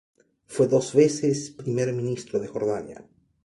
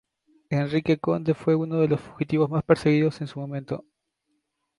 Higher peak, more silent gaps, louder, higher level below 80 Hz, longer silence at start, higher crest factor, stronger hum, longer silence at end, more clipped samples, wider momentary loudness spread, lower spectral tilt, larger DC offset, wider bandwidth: about the same, -6 dBFS vs -4 dBFS; neither; about the same, -25 LUFS vs -24 LUFS; second, -64 dBFS vs -58 dBFS; about the same, 0.5 s vs 0.5 s; about the same, 20 dB vs 20 dB; neither; second, 0.45 s vs 0.95 s; neither; about the same, 11 LU vs 12 LU; second, -6 dB/octave vs -8.5 dB/octave; neither; about the same, 11.5 kHz vs 11.5 kHz